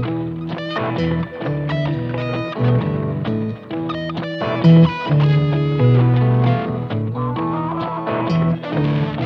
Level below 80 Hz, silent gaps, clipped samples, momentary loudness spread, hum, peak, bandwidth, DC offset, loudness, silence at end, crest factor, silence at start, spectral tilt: -44 dBFS; none; under 0.1%; 10 LU; none; -2 dBFS; 6 kHz; under 0.1%; -19 LUFS; 0 s; 16 dB; 0 s; -9.5 dB/octave